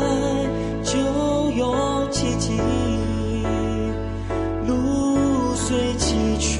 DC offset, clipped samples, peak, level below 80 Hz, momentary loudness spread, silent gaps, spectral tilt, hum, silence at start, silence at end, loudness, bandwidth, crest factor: under 0.1%; under 0.1%; -10 dBFS; -32 dBFS; 4 LU; none; -5 dB/octave; none; 0 s; 0 s; -22 LUFS; 11.5 kHz; 12 dB